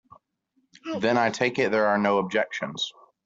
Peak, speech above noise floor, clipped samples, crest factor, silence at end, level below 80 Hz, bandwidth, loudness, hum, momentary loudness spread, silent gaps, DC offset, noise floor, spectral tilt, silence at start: -8 dBFS; 47 dB; under 0.1%; 18 dB; 0.35 s; -70 dBFS; 7.8 kHz; -25 LUFS; none; 10 LU; none; under 0.1%; -72 dBFS; -4.5 dB/octave; 0.85 s